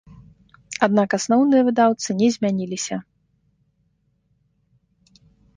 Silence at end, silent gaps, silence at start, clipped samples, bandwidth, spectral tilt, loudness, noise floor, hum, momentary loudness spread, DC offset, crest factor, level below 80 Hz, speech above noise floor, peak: 2.55 s; none; 0.1 s; under 0.1%; 10 kHz; -5 dB/octave; -20 LUFS; -67 dBFS; none; 12 LU; under 0.1%; 20 dB; -62 dBFS; 48 dB; -2 dBFS